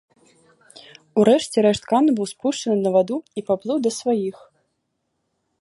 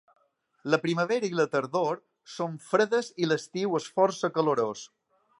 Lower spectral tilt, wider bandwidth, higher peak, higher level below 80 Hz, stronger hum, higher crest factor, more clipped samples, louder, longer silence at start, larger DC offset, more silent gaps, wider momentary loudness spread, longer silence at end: about the same, -5.5 dB/octave vs -5 dB/octave; about the same, 11.5 kHz vs 11.5 kHz; first, -2 dBFS vs -8 dBFS; first, -62 dBFS vs -80 dBFS; neither; about the same, 20 dB vs 20 dB; neither; first, -20 LUFS vs -28 LUFS; first, 1.15 s vs 0.65 s; neither; neither; about the same, 9 LU vs 11 LU; first, 1.3 s vs 0.55 s